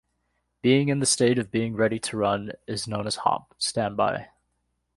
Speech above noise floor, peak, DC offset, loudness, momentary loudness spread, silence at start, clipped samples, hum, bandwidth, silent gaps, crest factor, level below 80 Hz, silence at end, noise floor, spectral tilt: 51 dB; -8 dBFS; under 0.1%; -25 LUFS; 9 LU; 0.65 s; under 0.1%; 60 Hz at -55 dBFS; 11.5 kHz; none; 18 dB; -58 dBFS; 0.7 s; -75 dBFS; -4.5 dB/octave